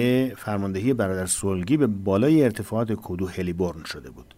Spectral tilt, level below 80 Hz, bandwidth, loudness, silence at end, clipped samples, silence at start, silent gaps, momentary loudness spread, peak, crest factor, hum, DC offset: -6 dB/octave; -54 dBFS; 16 kHz; -24 LUFS; 0.15 s; under 0.1%; 0 s; none; 9 LU; -8 dBFS; 16 dB; none; under 0.1%